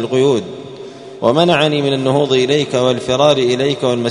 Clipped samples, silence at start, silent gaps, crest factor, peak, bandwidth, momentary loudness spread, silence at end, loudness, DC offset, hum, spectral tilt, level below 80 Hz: under 0.1%; 0 s; none; 14 dB; 0 dBFS; 11 kHz; 18 LU; 0 s; -14 LUFS; under 0.1%; none; -5.5 dB/octave; -54 dBFS